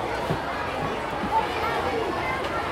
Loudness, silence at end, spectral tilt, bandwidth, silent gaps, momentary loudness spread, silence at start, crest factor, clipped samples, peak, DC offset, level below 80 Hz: -27 LUFS; 0 s; -5 dB/octave; 16 kHz; none; 3 LU; 0 s; 16 dB; under 0.1%; -12 dBFS; under 0.1%; -46 dBFS